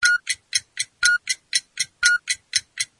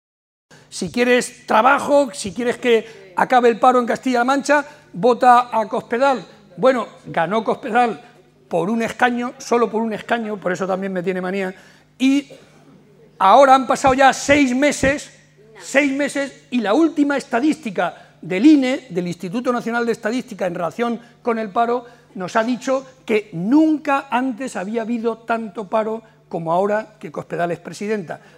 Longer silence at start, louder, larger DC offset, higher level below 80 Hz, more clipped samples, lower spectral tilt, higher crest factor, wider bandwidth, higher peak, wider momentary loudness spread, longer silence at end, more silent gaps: second, 0 s vs 0.7 s; second, -22 LUFS vs -18 LUFS; neither; second, -62 dBFS vs -54 dBFS; neither; second, 4.5 dB/octave vs -5 dB/octave; about the same, 22 dB vs 18 dB; second, 11.5 kHz vs 15 kHz; about the same, -2 dBFS vs 0 dBFS; second, 6 LU vs 12 LU; about the same, 0.15 s vs 0.2 s; neither